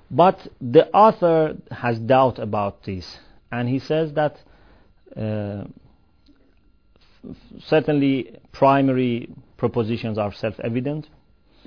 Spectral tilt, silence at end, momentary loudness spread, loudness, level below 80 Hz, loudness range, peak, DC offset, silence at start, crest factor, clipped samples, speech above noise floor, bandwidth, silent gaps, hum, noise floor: -8.5 dB/octave; 0.65 s; 18 LU; -21 LUFS; -54 dBFS; 9 LU; -2 dBFS; 0.2%; 0.1 s; 20 dB; under 0.1%; 38 dB; 5.4 kHz; none; none; -58 dBFS